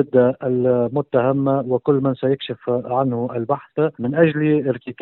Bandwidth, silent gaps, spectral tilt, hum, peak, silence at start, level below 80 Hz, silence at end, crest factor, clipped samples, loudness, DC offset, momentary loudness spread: 4.2 kHz; none; -12.5 dB/octave; none; -2 dBFS; 0 s; -60 dBFS; 0.1 s; 16 dB; under 0.1%; -20 LUFS; under 0.1%; 7 LU